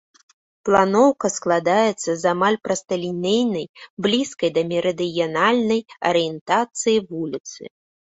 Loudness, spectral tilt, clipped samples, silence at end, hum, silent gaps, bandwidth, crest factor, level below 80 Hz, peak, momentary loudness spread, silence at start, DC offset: -20 LUFS; -4 dB/octave; under 0.1%; 0.45 s; none; 3.69-3.74 s, 3.90-3.97 s, 6.41-6.46 s, 7.40-7.44 s; 8.4 kHz; 20 dB; -62 dBFS; -2 dBFS; 11 LU; 0.65 s; under 0.1%